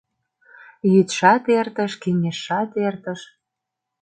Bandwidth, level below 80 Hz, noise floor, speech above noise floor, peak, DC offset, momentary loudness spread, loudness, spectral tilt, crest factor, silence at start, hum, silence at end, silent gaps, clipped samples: 9.2 kHz; -68 dBFS; -83 dBFS; 63 dB; -2 dBFS; under 0.1%; 12 LU; -20 LUFS; -6 dB/octave; 18 dB; 0.85 s; none; 0.8 s; none; under 0.1%